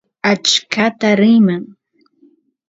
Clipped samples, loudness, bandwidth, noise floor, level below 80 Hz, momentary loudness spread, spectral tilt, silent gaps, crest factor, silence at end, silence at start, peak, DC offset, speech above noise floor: under 0.1%; -13 LUFS; 7.8 kHz; -54 dBFS; -64 dBFS; 6 LU; -4 dB/octave; none; 16 dB; 1.05 s; 0.25 s; 0 dBFS; under 0.1%; 41 dB